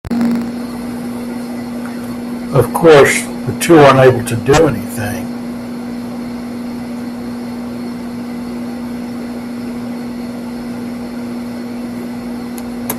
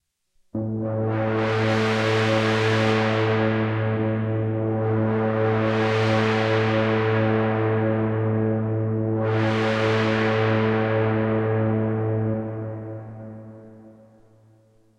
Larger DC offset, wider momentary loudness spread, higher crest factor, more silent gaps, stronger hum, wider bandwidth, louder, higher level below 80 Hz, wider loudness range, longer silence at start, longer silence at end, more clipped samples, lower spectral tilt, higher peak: neither; first, 16 LU vs 8 LU; about the same, 16 dB vs 14 dB; neither; first, 60 Hz at -25 dBFS vs none; first, 15.5 kHz vs 8.8 kHz; first, -16 LUFS vs -22 LUFS; first, -42 dBFS vs -54 dBFS; first, 13 LU vs 4 LU; second, 0.05 s vs 0.55 s; second, 0 s vs 1.1 s; neither; second, -5.5 dB/octave vs -7.5 dB/octave; first, 0 dBFS vs -10 dBFS